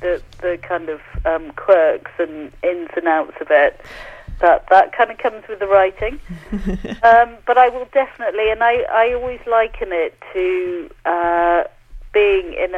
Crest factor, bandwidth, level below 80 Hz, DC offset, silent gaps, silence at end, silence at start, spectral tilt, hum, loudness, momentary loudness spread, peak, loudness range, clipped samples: 16 dB; 6.8 kHz; -38 dBFS; under 0.1%; none; 0 s; 0 s; -6.5 dB/octave; none; -17 LUFS; 12 LU; 0 dBFS; 3 LU; under 0.1%